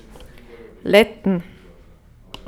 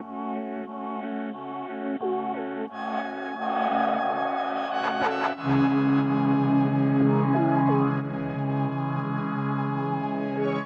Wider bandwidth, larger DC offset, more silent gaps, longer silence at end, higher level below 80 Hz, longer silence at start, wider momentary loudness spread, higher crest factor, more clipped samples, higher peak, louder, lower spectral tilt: first, 18.5 kHz vs 6.4 kHz; neither; neither; first, 1.05 s vs 0 s; first, -48 dBFS vs -64 dBFS; first, 0.85 s vs 0 s; first, 17 LU vs 11 LU; first, 22 dB vs 14 dB; neither; first, 0 dBFS vs -12 dBFS; first, -18 LUFS vs -26 LUFS; second, -5.5 dB/octave vs -9 dB/octave